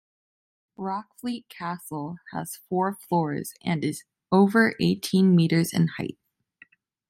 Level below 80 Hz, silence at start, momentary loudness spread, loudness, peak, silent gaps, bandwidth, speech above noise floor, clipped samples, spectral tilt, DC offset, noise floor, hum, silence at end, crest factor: -68 dBFS; 0.8 s; 15 LU; -25 LUFS; -8 dBFS; none; 16 kHz; 34 dB; under 0.1%; -6 dB/octave; under 0.1%; -58 dBFS; none; 0.95 s; 18 dB